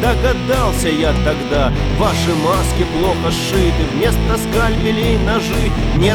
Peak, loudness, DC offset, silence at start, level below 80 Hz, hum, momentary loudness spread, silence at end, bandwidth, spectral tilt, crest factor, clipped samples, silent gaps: 0 dBFS; -16 LUFS; 0.5%; 0 s; -20 dBFS; none; 2 LU; 0 s; over 20 kHz; -5.5 dB/octave; 14 dB; under 0.1%; none